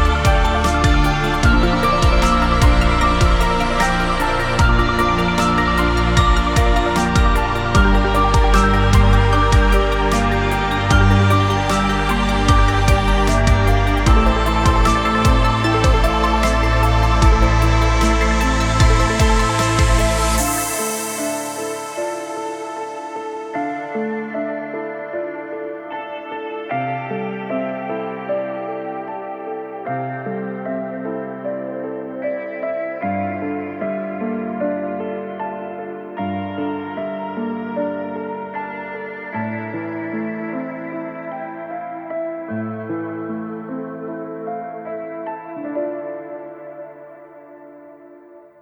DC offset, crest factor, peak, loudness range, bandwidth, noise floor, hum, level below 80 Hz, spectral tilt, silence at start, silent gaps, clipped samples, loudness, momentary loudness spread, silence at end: under 0.1%; 16 dB; 0 dBFS; 12 LU; 17 kHz; -43 dBFS; none; -22 dBFS; -5.5 dB/octave; 0 s; none; under 0.1%; -19 LUFS; 14 LU; 0.25 s